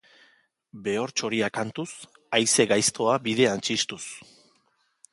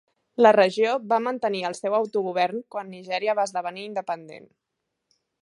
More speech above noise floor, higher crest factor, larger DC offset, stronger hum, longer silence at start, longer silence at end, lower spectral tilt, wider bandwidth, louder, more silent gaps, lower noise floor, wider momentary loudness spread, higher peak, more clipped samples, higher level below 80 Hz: second, 44 dB vs 57 dB; about the same, 22 dB vs 22 dB; neither; neither; first, 0.75 s vs 0.4 s; about the same, 0.9 s vs 1 s; second, -2.5 dB/octave vs -4.5 dB/octave; about the same, 11.5 kHz vs 11.5 kHz; about the same, -24 LUFS vs -24 LUFS; neither; second, -69 dBFS vs -81 dBFS; about the same, 17 LU vs 15 LU; about the same, -6 dBFS vs -4 dBFS; neither; first, -68 dBFS vs -80 dBFS